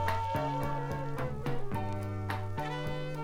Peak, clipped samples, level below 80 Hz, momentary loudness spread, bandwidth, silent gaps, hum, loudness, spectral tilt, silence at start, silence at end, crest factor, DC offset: -18 dBFS; under 0.1%; -46 dBFS; 4 LU; 16 kHz; none; none; -36 LUFS; -7 dB/octave; 0 s; 0 s; 16 dB; under 0.1%